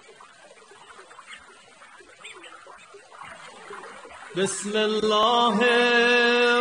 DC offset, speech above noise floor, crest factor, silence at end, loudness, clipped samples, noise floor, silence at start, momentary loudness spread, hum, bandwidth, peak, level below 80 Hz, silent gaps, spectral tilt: under 0.1%; 29 dB; 18 dB; 0 s; -20 LUFS; under 0.1%; -50 dBFS; 1 s; 25 LU; none; 10 kHz; -8 dBFS; -70 dBFS; none; -3 dB/octave